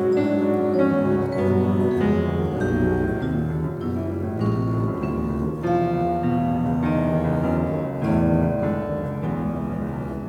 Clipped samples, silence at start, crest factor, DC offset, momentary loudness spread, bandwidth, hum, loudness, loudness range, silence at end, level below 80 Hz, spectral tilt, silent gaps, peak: under 0.1%; 0 s; 14 dB; under 0.1%; 6 LU; 12 kHz; none; -23 LUFS; 3 LU; 0 s; -42 dBFS; -9.5 dB/octave; none; -8 dBFS